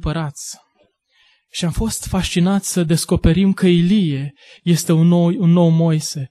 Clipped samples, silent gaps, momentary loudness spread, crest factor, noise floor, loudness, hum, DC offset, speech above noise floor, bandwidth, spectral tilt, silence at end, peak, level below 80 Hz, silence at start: under 0.1%; none; 13 LU; 16 dB; -60 dBFS; -16 LUFS; none; under 0.1%; 44 dB; 13 kHz; -6 dB/octave; 0.05 s; -2 dBFS; -34 dBFS; 0 s